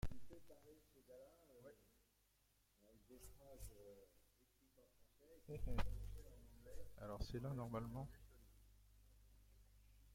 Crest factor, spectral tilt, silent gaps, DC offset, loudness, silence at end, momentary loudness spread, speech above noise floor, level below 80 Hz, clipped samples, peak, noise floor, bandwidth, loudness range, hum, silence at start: 24 dB; -6.5 dB/octave; none; under 0.1%; -53 LUFS; 0 s; 18 LU; 33 dB; -58 dBFS; under 0.1%; -28 dBFS; -80 dBFS; 16.5 kHz; 14 LU; none; 0 s